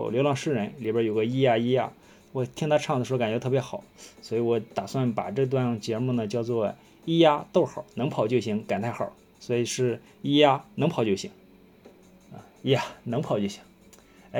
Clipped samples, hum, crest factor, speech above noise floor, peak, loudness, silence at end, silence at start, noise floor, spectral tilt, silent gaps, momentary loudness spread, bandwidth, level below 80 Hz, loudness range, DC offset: under 0.1%; none; 22 dB; 28 dB; -4 dBFS; -26 LUFS; 0 s; 0 s; -54 dBFS; -6 dB/octave; none; 12 LU; 18 kHz; -66 dBFS; 3 LU; under 0.1%